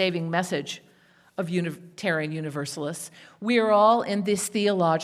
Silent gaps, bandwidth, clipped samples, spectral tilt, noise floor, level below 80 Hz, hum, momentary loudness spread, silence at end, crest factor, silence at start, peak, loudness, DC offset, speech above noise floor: none; 16 kHz; under 0.1%; -5 dB/octave; -58 dBFS; -74 dBFS; none; 16 LU; 0 s; 18 dB; 0 s; -8 dBFS; -25 LUFS; under 0.1%; 34 dB